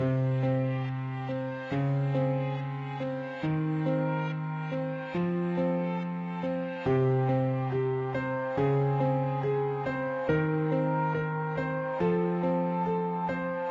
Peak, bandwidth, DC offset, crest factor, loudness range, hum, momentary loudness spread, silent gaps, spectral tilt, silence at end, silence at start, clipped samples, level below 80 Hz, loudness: -14 dBFS; 5.4 kHz; under 0.1%; 14 dB; 3 LU; none; 7 LU; none; -10 dB/octave; 0 s; 0 s; under 0.1%; -60 dBFS; -30 LUFS